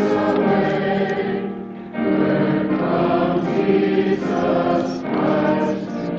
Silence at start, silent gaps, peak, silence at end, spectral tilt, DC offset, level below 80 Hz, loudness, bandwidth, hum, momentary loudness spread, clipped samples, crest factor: 0 s; none; -4 dBFS; 0 s; -8 dB/octave; under 0.1%; -52 dBFS; -19 LUFS; 7.4 kHz; none; 7 LU; under 0.1%; 14 dB